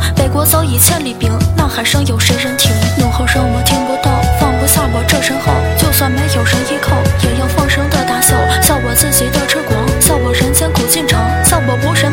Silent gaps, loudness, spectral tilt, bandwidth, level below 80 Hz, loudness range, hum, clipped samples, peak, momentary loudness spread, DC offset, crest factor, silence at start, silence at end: none; -11 LUFS; -4 dB/octave; 18.5 kHz; -22 dBFS; 1 LU; none; under 0.1%; 0 dBFS; 4 LU; 0.2%; 12 dB; 0 s; 0 s